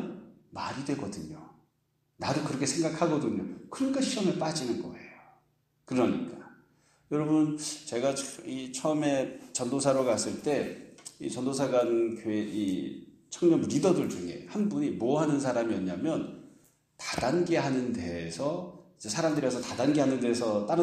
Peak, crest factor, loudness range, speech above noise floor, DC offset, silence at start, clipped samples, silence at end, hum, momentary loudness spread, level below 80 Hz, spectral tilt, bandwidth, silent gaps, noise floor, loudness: -12 dBFS; 18 dB; 4 LU; 46 dB; under 0.1%; 0 s; under 0.1%; 0 s; none; 14 LU; -66 dBFS; -5 dB/octave; 13.5 kHz; none; -75 dBFS; -30 LUFS